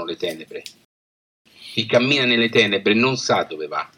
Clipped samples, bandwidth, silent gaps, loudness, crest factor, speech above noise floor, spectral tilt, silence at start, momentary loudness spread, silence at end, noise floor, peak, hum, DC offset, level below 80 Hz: under 0.1%; 16.5 kHz; 0.85-1.45 s; -18 LUFS; 20 dB; over 70 dB; -4 dB/octave; 0 s; 14 LU; 0.1 s; under -90 dBFS; 0 dBFS; none; under 0.1%; -68 dBFS